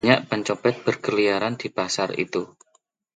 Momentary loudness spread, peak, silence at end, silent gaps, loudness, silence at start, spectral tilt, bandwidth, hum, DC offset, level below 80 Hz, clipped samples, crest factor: 7 LU; -2 dBFS; 0.7 s; none; -24 LUFS; 0.05 s; -4.5 dB/octave; 9.4 kHz; none; under 0.1%; -64 dBFS; under 0.1%; 22 dB